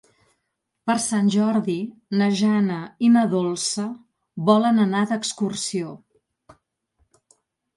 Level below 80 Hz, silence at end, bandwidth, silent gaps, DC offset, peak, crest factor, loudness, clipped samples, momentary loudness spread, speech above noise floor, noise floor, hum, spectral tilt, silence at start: -68 dBFS; 1.8 s; 11.5 kHz; none; under 0.1%; -4 dBFS; 18 dB; -22 LUFS; under 0.1%; 12 LU; 57 dB; -77 dBFS; none; -5 dB/octave; 0.85 s